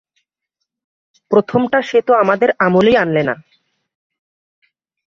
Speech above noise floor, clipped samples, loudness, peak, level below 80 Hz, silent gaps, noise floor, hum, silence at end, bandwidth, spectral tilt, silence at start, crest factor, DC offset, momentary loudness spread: 64 dB; under 0.1%; -14 LUFS; 0 dBFS; -54 dBFS; none; -77 dBFS; none; 1.75 s; 7.4 kHz; -7 dB/octave; 1.3 s; 16 dB; under 0.1%; 6 LU